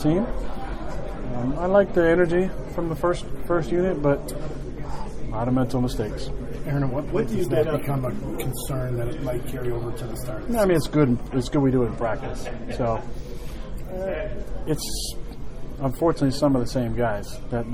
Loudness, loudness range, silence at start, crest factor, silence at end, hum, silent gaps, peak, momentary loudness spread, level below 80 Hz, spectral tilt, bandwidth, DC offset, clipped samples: -25 LUFS; 6 LU; 0 s; 20 dB; 0 s; none; none; -4 dBFS; 14 LU; -34 dBFS; -6.5 dB/octave; 16 kHz; under 0.1%; under 0.1%